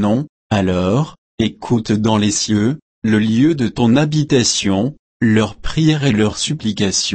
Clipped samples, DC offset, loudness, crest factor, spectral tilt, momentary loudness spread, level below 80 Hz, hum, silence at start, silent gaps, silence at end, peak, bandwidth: under 0.1%; under 0.1%; -16 LUFS; 14 dB; -5 dB/octave; 7 LU; -38 dBFS; none; 0 s; 0.29-0.50 s, 1.18-1.38 s, 2.82-3.02 s, 4.99-5.20 s; 0 s; -2 dBFS; 8.8 kHz